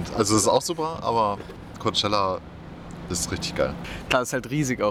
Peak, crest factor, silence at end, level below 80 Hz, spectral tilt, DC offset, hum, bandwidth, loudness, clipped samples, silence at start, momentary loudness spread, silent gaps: -4 dBFS; 22 dB; 0 s; -46 dBFS; -3.5 dB/octave; under 0.1%; none; 17.5 kHz; -24 LUFS; under 0.1%; 0 s; 16 LU; none